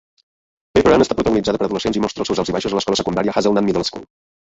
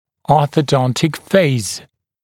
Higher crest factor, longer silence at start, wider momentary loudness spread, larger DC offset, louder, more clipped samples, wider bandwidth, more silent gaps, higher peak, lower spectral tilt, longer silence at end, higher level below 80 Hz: about the same, 16 dB vs 16 dB; first, 0.75 s vs 0.3 s; about the same, 7 LU vs 8 LU; neither; about the same, -18 LUFS vs -16 LUFS; neither; second, 8 kHz vs 17 kHz; neither; about the same, -2 dBFS vs 0 dBFS; about the same, -5 dB/octave vs -5.5 dB/octave; about the same, 0.45 s vs 0.45 s; first, -42 dBFS vs -50 dBFS